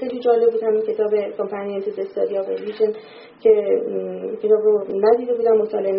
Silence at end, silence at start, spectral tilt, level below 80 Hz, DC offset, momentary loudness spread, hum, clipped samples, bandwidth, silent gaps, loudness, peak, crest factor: 0 s; 0 s; -5.5 dB/octave; -68 dBFS; under 0.1%; 9 LU; none; under 0.1%; 5.4 kHz; none; -20 LUFS; -4 dBFS; 16 dB